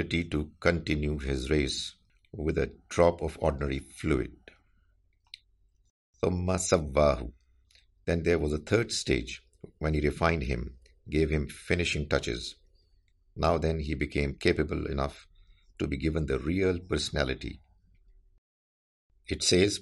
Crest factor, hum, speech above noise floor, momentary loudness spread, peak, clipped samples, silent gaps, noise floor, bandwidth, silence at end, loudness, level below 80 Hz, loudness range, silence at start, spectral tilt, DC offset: 22 dB; none; 39 dB; 12 LU; -8 dBFS; under 0.1%; 5.90-6.13 s, 18.38-19.10 s; -68 dBFS; 11.5 kHz; 0 s; -30 LUFS; -42 dBFS; 3 LU; 0 s; -5 dB/octave; under 0.1%